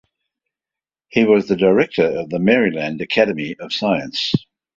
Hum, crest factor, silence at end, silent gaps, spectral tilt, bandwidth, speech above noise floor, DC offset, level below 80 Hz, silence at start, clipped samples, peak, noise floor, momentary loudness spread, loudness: none; 18 dB; 0.4 s; none; -6 dB/octave; 7.6 kHz; 72 dB; under 0.1%; -56 dBFS; 1.15 s; under 0.1%; -2 dBFS; -89 dBFS; 8 LU; -18 LUFS